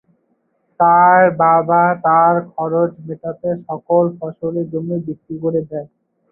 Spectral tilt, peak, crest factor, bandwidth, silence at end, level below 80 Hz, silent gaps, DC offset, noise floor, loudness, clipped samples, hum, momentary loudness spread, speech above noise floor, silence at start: -14 dB/octave; -2 dBFS; 14 dB; 2.9 kHz; 0.45 s; -62 dBFS; none; under 0.1%; -64 dBFS; -15 LUFS; under 0.1%; none; 14 LU; 49 dB; 0.8 s